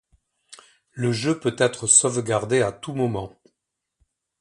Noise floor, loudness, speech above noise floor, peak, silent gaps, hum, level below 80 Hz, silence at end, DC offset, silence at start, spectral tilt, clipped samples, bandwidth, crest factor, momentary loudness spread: -80 dBFS; -21 LUFS; 58 dB; 0 dBFS; none; none; -58 dBFS; 1.15 s; under 0.1%; 0.5 s; -3.5 dB/octave; under 0.1%; 11.5 kHz; 24 dB; 11 LU